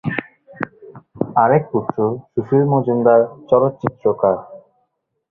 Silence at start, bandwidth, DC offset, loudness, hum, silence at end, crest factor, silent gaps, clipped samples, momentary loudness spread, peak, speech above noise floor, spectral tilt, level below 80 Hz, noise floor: 0.05 s; 4 kHz; under 0.1%; -17 LUFS; none; 0.75 s; 18 dB; none; under 0.1%; 13 LU; 0 dBFS; 54 dB; -11 dB/octave; -56 dBFS; -70 dBFS